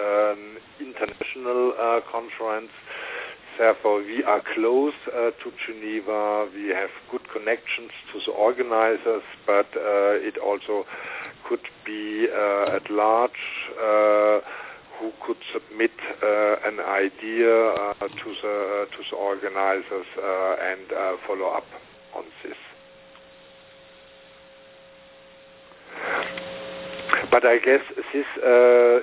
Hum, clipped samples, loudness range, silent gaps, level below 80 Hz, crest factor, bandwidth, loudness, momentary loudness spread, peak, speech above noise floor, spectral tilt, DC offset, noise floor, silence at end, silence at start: none; under 0.1%; 10 LU; none; -68 dBFS; 22 dB; 4 kHz; -24 LUFS; 16 LU; -2 dBFS; 26 dB; -7.5 dB/octave; under 0.1%; -49 dBFS; 0 s; 0 s